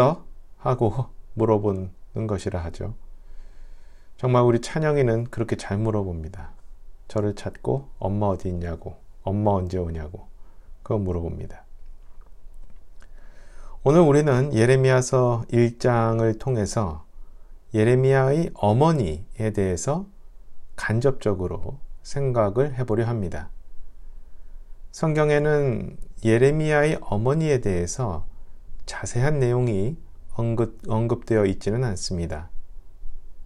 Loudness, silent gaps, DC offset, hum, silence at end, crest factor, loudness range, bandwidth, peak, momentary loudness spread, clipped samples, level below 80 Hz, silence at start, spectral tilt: -23 LUFS; none; under 0.1%; none; 0 s; 20 dB; 8 LU; 11.5 kHz; -4 dBFS; 16 LU; under 0.1%; -38 dBFS; 0 s; -7 dB/octave